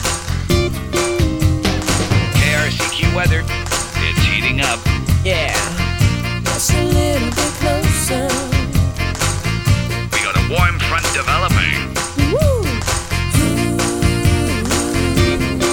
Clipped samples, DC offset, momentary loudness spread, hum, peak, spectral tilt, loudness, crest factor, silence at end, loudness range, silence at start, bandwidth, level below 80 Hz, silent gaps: under 0.1%; under 0.1%; 4 LU; none; -2 dBFS; -4.5 dB/octave; -16 LUFS; 14 dB; 0 s; 1 LU; 0 s; 17.5 kHz; -24 dBFS; none